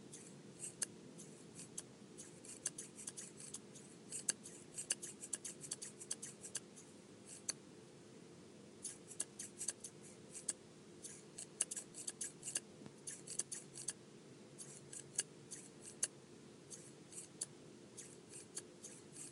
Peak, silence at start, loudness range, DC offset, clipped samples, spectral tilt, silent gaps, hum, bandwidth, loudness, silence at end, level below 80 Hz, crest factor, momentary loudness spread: -16 dBFS; 0 s; 4 LU; under 0.1%; under 0.1%; -1.5 dB/octave; none; none; 15.5 kHz; -47 LUFS; 0 s; -88 dBFS; 34 dB; 16 LU